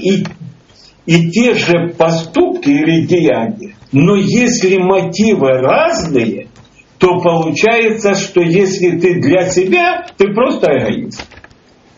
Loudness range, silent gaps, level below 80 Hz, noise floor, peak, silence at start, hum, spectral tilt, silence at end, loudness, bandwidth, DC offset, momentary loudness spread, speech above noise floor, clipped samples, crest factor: 1 LU; none; -46 dBFS; -45 dBFS; 0 dBFS; 0 s; none; -5 dB/octave; 0.7 s; -12 LUFS; 7.8 kHz; under 0.1%; 6 LU; 34 dB; under 0.1%; 12 dB